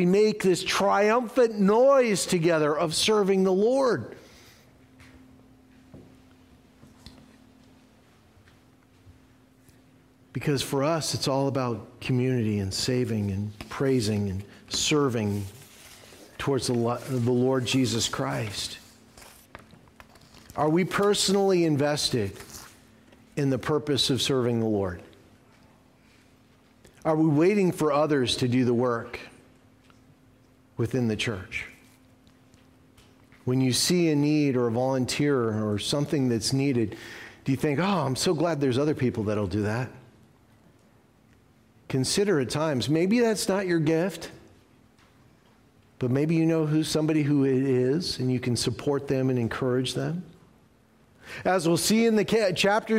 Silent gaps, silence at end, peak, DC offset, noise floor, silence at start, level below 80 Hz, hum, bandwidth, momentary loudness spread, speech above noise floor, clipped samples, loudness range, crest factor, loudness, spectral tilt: none; 0 s; -12 dBFS; under 0.1%; -60 dBFS; 0 s; -58 dBFS; none; 16 kHz; 11 LU; 35 dB; under 0.1%; 6 LU; 14 dB; -25 LUFS; -5 dB/octave